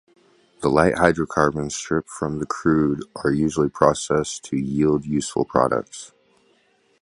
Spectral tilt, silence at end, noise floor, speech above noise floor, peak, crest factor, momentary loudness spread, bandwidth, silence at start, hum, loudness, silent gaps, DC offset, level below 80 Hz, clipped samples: -5.5 dB/octave; 0.95 s; -62 dBFS; 41 dB; 0 dBFS; 22 dB; 8 LU; 11.5 kHz; 0.6 s; none; -21 LUFS; none; under 0.1%; -46 dBFS; under 0.1%